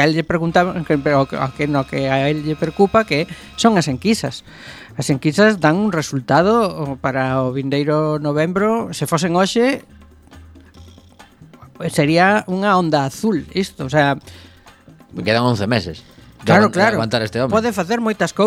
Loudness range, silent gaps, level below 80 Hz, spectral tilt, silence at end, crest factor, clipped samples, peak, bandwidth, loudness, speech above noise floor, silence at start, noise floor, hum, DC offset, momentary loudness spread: 3 LU; none; -48 dBFS; -5.5 dB/octave; 0 s; 18 dB; under 0.1%; 0 dBFS; 15 kHz; -17 LUFS; 28 dB; 0 s; -45 dBFS; none; under 0.1%; 9 LU